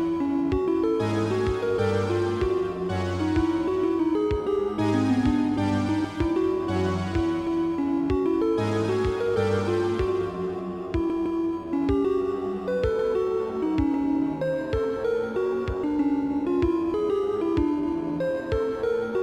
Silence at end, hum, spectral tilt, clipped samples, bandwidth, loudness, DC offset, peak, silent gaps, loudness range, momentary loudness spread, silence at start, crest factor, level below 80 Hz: 0 s; none; -7.5 dB/octave; under 0.1%; 11 kHz; -25 LUFS; under 0.1%; -10 dBFS; none; 2 LU; 3 LU; 0 s; 14 dB; -42 dBFS